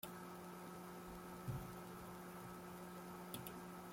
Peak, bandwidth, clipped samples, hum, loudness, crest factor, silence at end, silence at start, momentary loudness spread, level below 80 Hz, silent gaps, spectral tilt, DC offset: -32 dBFS; 16.5 kHz; under 0.1%; none; -52 LUFS; 22 dB; 0 s; 0 s; 4 LU; -68 dBFS; none; -5 dB/octave; under 0.1%